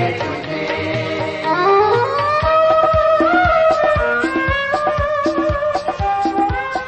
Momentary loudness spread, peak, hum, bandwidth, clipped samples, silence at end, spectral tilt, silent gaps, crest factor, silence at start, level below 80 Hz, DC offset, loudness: 7 LU; -4 dBFS; none; 8.6 kHz; under 0.1%; 0 s; -6 dB/octave; none; 12 dB; 0 s; -34 dBFS; under 0.1%; -16 LUFS